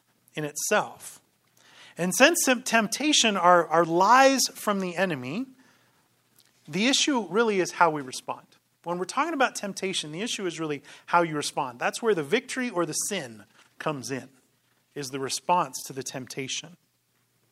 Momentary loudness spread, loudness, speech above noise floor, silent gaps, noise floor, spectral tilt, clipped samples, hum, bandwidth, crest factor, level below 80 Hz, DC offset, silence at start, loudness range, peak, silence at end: 16 LU; -25 LUFS; 45 dB; none; -70 dBFS; -3 dB/octave; under 0.1%; none; 16 kHz; 24 dB; -78 dBFS; under 0.1%; 0.35 s; 10 LU; -2 dBFS; 0.8 s